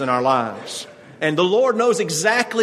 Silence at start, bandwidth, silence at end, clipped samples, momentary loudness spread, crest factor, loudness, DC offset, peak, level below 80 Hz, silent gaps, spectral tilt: 0 s; 13.5 kHz; 0 s; under 0.1%; 14 LU; 18 dB; -18 LUFS; under 0.1%; -2 dBFS; -66 dBFS; none; -3.5 dB/octave